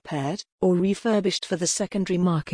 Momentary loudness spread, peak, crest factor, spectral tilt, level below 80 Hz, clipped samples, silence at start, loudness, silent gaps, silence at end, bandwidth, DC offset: 6 LU; -12 dBFS; 12 dB; -5 dB/octave; -58 dBFS; under 0.1%; 0.05 s; -24 LUFS; 0.52-0.58 s; 0 s; 10.5 kHz; under 0.1%